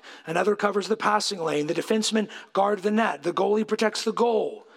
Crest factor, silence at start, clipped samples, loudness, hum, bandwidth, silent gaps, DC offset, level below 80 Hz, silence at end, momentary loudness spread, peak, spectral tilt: 18 dB; 0.05 s; under 0.1%; -25 LUFS; none; 15 kHz; none; under 0.1%; -80 dBFS; 0.15 s; 4 LU; -8 dBFS; -4 dB/octave